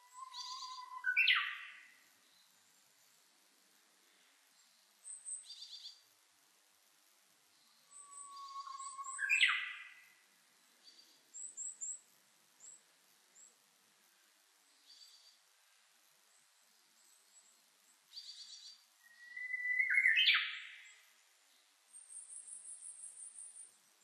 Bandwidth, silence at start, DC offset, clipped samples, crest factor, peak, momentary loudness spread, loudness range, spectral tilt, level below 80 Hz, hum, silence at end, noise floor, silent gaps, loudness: 13 kHz; 0.15 s; under 0.1%; under 0.1%; 28 dB; -14 dBFS; 28 LU; 20 LU; 6 dB/octave; under -90 dBFS; none; 0.35 s; -71 dBFS; none; -36 LUFS